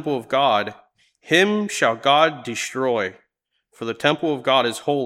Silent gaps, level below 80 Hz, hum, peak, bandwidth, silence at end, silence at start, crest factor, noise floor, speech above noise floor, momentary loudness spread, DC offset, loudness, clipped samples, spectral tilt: none; -72 dBFS; none; -2 dBFS; 15.5 kHz; 0 s; 0 s; 20 dB; -73 dBFS; 53 dB; 10 LU; under 0.1%; -20 LUFS; under 0.1%; -3.5 dB/octave